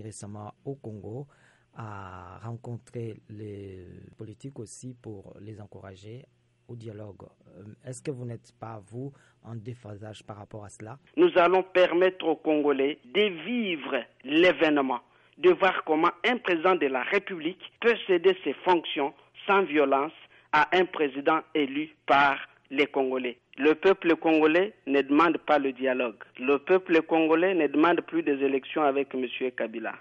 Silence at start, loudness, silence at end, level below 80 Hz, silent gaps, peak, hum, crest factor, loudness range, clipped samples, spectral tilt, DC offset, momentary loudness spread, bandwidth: 0 s; -25 LUFS; 0 s; -70 dBFS; none; -10 dBFS; none; 16 dB; 18 LU; under 0.1%; -6 dB/octave; under 0.1%; 21 LU; 11 kHz